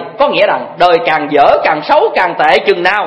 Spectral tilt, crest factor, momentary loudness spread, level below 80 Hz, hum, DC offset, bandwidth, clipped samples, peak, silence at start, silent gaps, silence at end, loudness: -5 dB/octave; 10 dB; 3 LU; -48 dBFS; none; under 0.1%; 11 kHz; 0.5%; 0 dBFS; 0 s; none; 0 s; -10 LUFS